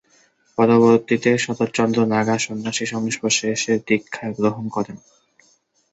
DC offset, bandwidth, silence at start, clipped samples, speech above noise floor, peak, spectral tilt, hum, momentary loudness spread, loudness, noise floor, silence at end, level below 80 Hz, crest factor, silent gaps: under 0.1%; 8.2 kHz; 0.6 s; under 0.1%; 41 dB; -2 dBFS; -4.5 dB/octave; none; 11 LU; -19 LUFS; -60 dBFS; 0.95 s; -60 dBFS; 18 dB; none